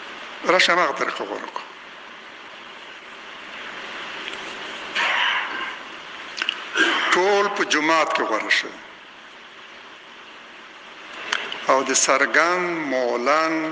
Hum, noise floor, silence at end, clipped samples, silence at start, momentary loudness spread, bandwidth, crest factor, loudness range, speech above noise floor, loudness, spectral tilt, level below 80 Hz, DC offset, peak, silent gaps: none; -43 dBFS; 0 s; under 0.1%; 0 s; 23 LU; 10.5 kHz; 22 dB; 11 LU; 22 dB; -21 LUFS; -1 dB/octave; -70 dBFS; under 0.1%; -2 dBFS; none